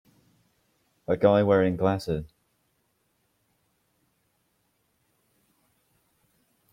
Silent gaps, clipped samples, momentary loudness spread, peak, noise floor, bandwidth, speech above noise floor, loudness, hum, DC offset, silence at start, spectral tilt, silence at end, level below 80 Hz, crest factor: none; under 0.1%; 12 LU; -8 dBFS; -73 dBFS; 14.5 kHz; 50 dB; -24 LUFS; none; under 0.1%; 1.1 s; -8 dB/octave; 4.45 s; -58 dBFS; 22 dB